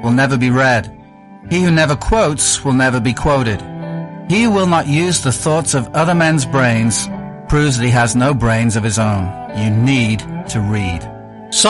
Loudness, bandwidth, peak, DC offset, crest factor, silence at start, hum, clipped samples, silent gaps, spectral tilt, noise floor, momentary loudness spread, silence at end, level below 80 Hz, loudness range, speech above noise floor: -14 LUFS; 11.5 kHz; 0 dBFS; under 0.1%; 14 dB; 0 s; none; under 0.1%; none; -4.5 dB/octave; -38 dBFS; 10 LU; 0 s; -32 dBFS; 1 LU; 24 dB